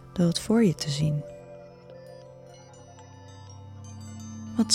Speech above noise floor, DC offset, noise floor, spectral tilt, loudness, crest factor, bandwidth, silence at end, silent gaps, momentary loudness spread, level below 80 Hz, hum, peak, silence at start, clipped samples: 24 dB; under 0.1%; -48 dBFS; -5.5 dB/octave; -26 LUFS; 24 dB; 15.5 kHz; 0 s; none; 25 LU; -58 dBFS; none; -6 dBFS; 0 s; under 0.1%